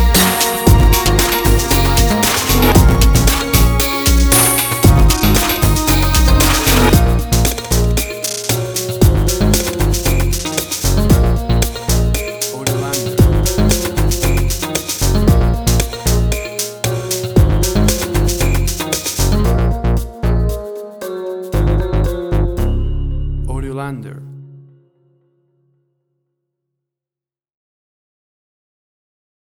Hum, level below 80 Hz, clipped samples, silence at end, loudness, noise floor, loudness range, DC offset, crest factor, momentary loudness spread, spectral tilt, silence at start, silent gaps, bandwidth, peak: none; -18 dBFS; under 0.1%; 4.95 s; -14 LUFS; -90 dBFS; 8 LU; under 0.1%; 14 dB; 10 LU; -4.5 dB/octave; 0 s; none; over 20 kHz; 0 dBFS